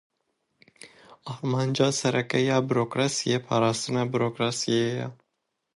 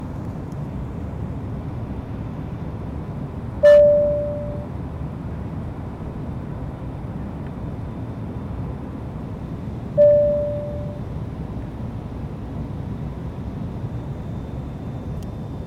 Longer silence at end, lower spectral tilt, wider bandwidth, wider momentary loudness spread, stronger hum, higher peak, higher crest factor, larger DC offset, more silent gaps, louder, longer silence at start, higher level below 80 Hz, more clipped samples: first, 0.6 s vs 0 s; second, -5 dB/octave vs -9 dB/octave; first, 11.5 kHz vs 6.8 kHz; second, 9 LU vs 15 LU; neither; about the same, -8 dBFS vs -6 dBFS; about the same, 18 dB vs 18 dB; neither; neither; about the same, -25 LUFS vs -24 LUFS; first, 0.85 s vs 0 s; second, -68 dBFS vs -36 dBFS; neither